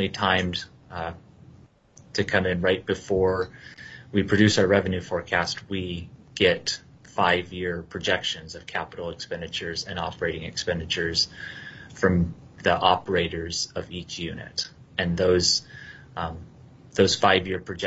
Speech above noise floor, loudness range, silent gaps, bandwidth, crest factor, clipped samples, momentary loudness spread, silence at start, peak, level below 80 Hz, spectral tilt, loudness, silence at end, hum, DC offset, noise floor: 28 dB; 5 LU; none; 8.2 kHz; 24 dB; under 0.1%; 14 LU; 0 s; -2 dBFS; -54 dBFS; -4 dB/octave; -25 LUFS; 0 s; none; under 0.1%; -53 dBFS